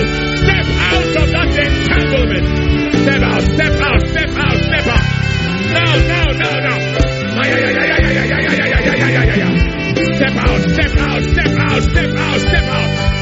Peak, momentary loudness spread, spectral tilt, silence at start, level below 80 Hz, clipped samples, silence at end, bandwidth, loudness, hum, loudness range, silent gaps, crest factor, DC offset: 0 dBFS; 3 LU; -4.5 dB/octave; 0 s; -20 dBFS; under 0.1%; 0 s; 8 kHz; -13 LUFS; none; 1 LU; none; 12 dB; under 0.1%